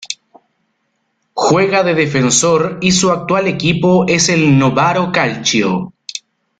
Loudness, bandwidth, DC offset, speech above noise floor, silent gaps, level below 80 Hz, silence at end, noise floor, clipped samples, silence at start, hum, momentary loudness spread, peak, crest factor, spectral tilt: -13 LUFS; 9.6 kHz; under 0.1%; 54 dB; none; -50 dBFS; 0.4 s; -66 dBFS; under 0.1%; 0 s; none; 16 LU; 0 dBFS; 14 dB; -4 dB/octave